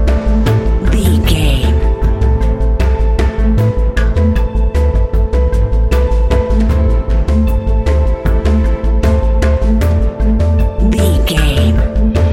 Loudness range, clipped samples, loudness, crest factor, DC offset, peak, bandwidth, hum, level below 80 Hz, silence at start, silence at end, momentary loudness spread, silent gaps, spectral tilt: 1 LU; under 0.1%; -13 LUFS; 10 dB; under 0.1%; 0 dBFS; 13.5 kHz; none; -12 dBFS; 0 s; 0 s; 2 LU; none; -7 dB/octave